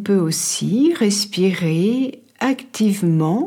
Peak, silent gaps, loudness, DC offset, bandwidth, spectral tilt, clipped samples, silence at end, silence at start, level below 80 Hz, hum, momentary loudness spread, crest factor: -6 dBFS; none; -18 LUFS; under 0.1%; 17.5 kHz; -5 dB/octave; under 0.1%; 0 s; 0 s; -70 dBFS; none; 5 LU; 12 dB